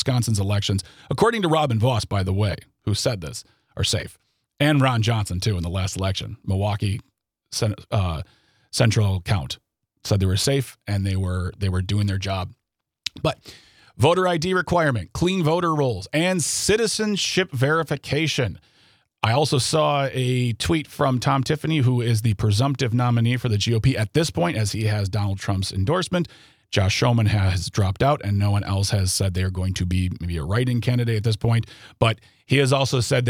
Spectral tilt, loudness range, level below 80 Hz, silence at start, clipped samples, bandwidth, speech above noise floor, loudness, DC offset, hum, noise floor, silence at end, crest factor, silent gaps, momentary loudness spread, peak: -5 dB/octave; 4 LU; -48 dBFS; 0 s; under 0.1%; 15.5 kHz; 38 dB; -22 LUFS; under 0.1%; none; -59 dBFS; 0 s; 20 dB; none; 8 LU; -2 dBFS